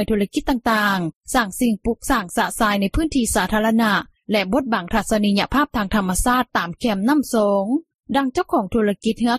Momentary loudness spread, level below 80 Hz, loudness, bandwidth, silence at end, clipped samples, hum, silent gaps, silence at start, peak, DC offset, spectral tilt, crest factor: 4 LU; -36 dBFS; -20 LUFS; 15 kHz; 0 s; under 0.1%; none; 1.15-1.21 s, 7.95-7.99 s; 0 s; -4 dBFS; under 0.1%; -4.5 dB/octave; 16 dB